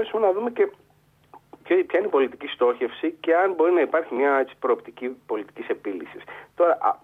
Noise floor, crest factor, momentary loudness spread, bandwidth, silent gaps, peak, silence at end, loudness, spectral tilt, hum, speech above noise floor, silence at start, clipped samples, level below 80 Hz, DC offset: -53 dBFS; 16 dB; 13 LU; 4 kHz; none; -8 dBFS; 0.05 s; -23 LUFS; -6 dB/octave; 50 Hz at -65 dBFS; 30 dB; 0 s; under 0.1%; -72 dBFS; under 0.1%